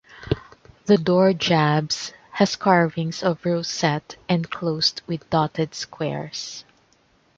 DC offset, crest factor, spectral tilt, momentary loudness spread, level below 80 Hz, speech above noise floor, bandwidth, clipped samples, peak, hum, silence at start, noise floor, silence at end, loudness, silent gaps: under 0.1%; 20 dB; -5 dB/octave; 12 LU; -52 dBFS; 39 dB; 7.8 kHz; under 0.1%; -2 dBFS; none; 0.15 s; -61 dBFS; 0.75 s; -22 LUFS; none